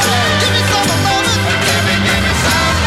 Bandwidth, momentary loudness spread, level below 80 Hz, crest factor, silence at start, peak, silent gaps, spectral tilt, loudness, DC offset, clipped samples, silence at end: 16.5 kHz; 1 LU; -28 dBFS; 12 dB; 0 s; -2 dBFS; none; -3.5 dB/octave; -12 LUFS; 0.6%; under 0.1%; 0 s